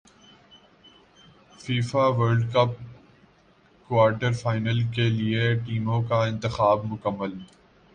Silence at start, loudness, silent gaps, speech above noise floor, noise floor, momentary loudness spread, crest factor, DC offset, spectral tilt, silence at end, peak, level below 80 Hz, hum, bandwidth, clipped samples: 1.6 s; -24 LUFS; none; 35 dB; -58 dBFS; 10 LU; 18 dB; under 0.1%; -7 dB/octave; 0.5 s; -8 dBFS; -54 dBFS; none; 9.4 kHz; under 0.1%